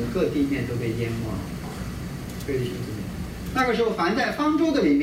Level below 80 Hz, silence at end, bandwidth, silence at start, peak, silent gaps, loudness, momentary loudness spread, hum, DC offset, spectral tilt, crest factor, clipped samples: -42 dBFS; 0 s; 16 kHz; 0 s; -10 dBFS; none; -26 LUFS; 12 LU; none; under 0.1%; -6.5 dB/octave; 14 dB; under 0.1%